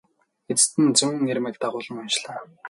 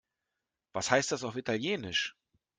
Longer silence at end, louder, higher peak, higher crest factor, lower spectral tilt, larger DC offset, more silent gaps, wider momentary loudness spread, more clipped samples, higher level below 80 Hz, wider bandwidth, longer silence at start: second, 0 s vs 0.5 s; first, -22 LUFS vs -32 LUFS; first, -2 dBFS vs -10 dBFS; about the same, 22 dB vs 24 dB; about the same, -2.5 dB/octave vs -3 dB/octave; neither; neither; about the same, 11 LU vs 9 LU; neither; about the same, -70 dBFS vs -70 dBFS; first, 11.5 kHz vs 10 kHz; second, 0.5 s vs 0.75 s